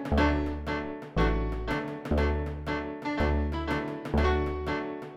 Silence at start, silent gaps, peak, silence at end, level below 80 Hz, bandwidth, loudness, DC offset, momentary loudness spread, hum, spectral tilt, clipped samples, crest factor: 0 s; none; -12 dBFS; 0 s; -34 dBFS; 7.8 kHz; -30 LUFS; under 0.1%; 7 LU; none; -7.5 dB/octave; under 0.1%; 16 dB